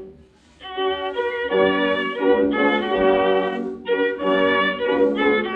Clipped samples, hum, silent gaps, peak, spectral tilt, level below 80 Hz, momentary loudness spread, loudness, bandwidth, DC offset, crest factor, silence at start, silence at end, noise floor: under 0.1%; none; none; -6 dBFS; -7 dB/octave; -52 dBFS; 7 LU; -20 LUFS; 5.4 kHz; under 0.1%; 14 dB; 0 s; 0 s; -50 dBFS